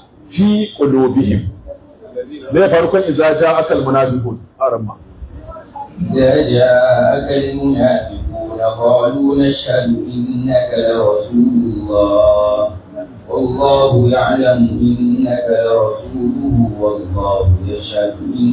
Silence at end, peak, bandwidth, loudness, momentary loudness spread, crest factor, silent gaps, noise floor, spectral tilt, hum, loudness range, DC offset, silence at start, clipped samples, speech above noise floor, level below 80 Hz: 0 s; 0 dBFS; 4 kHz; -14 LUFS; 14 LU; 12 dB; none; -34 dBFS; -11.5 dB/octave; none; 2 LU; under 0.1%; 0.3 s; under 0.1%; 21 dB; -32 dBFS